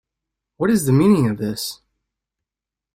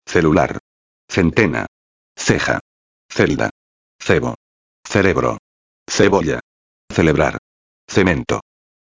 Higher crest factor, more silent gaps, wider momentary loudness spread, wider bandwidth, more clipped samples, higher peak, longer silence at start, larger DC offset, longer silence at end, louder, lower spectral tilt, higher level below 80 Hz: about the same, 16 dB vs 18 dB; second, none vs 0.60-1.08 s, 1.68-2.15 s, 2.61-3.09 s, 3.51-3.99 s, 4.35-4.83 s, 5.39-5.86 s, 6.43-6.88 s, 7.38-7.88 s; about the same, 12 LU vs 12 LU; first, 16.5 kHz vs 8 kHz; neither; second, -4 dBFS vs 0 dBFS; first, 0.6 s vs 0.1 s; neither; first, 1.2 s vs 0.55 s; about the same, -18 LUFS vs -18 LUFS; about the same, -6.5 dB/octave vs -5.5 dB/octave; second, -54 dBFS vs -38 dBFS